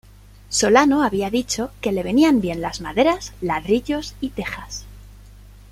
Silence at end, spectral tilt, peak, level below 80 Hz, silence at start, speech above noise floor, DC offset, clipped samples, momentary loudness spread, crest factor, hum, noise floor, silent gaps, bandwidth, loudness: 0.3 s; -4 dB/octave; -2 dBFS; -42 dBFS; 0.5 s; 24 dB; under 0.1%; under 0.1%; 14 LU; 20 dB; 50 Hz at -40 dBFS; -44 dBFS; none; 16 kHz; -20 LUFS